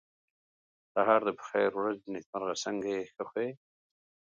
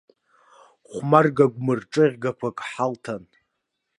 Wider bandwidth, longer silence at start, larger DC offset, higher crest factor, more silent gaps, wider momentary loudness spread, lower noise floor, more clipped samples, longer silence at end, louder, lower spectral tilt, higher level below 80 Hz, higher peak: second, 9 kHz vs 11 kHz; about the same, 0.95 s vs 0.9 s; neither; about the same, 22 dB vs 22 dB; first, 2.26-2.33 s vs none; second, 11 LU vs 16 LU; first, under -90 dBFS vs -78 dBFS; neither; about the same, 0.75 s vs 0.8 s; second, -32 LUFS vs -22 LUFS; second, -4 dB/octave vs -7 dB/octave; second, -78 dBFS vs -68 dBFS; second, -12 dBFS vs -2 dBFS